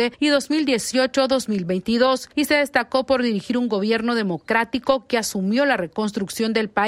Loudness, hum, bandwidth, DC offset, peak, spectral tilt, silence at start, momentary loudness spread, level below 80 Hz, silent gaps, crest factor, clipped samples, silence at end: -21 LUFS; none; 16 kHz; under 0.1%; -4 dBFS; -4 dB/octave; 0 s; 4 LU; -56 dBFS; none; 16 dB; under 0.1%; 0 s